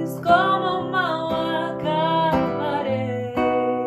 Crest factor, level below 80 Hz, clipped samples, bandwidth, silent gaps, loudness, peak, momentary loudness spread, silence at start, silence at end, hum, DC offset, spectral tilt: 18 dB; -52 dBFS; under 0.1%; 14 kHz; none; -22 LUFS; -4 dBFS; 7 LU; 0 s; 0 s; none; under 0.1%; -6.5 dB/octave